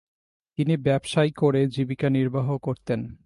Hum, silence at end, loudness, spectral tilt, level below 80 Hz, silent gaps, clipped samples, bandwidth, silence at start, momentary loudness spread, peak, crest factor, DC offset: none; 0.1 s; -24 LUFS; -7.5 dB/octave; -56 dBFS; none; under 0.1%; 11.5 kHz; 0.6 s; 7 LU; -10 dBFS; 16 dB; under 0.1%